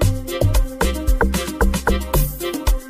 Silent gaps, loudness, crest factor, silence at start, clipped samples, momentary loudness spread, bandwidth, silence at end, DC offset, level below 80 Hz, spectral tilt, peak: none; -20 LUFS; 16 dB; 0 s; under 0.1%; 3 LU; 15.5 kHz; 0 s; under 0.1%; -20 dBFS; -5 dB/octave; -2 dBFS